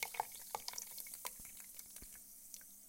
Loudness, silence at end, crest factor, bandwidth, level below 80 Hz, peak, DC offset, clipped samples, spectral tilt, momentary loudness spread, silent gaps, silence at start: -48 LUFS; 0 s; 32 dB; 17 kHz; -72 dBFS; -18 dBFS; under 0.1%; under 0.1%; 0.5 dB/octave; 8 LU; none; 0 s